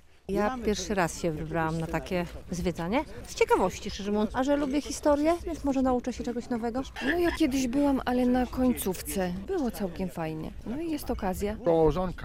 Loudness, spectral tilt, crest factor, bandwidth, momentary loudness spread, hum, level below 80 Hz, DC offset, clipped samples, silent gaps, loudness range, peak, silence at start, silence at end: -29 LUFS; -5.5 dB/octave; 18 dB; 16 kHz; 8 LU; none; -44 dBFS; under 0.1%; under 0.1%; none; 3 LU; -10 dBFS; 0.3 s; 0 s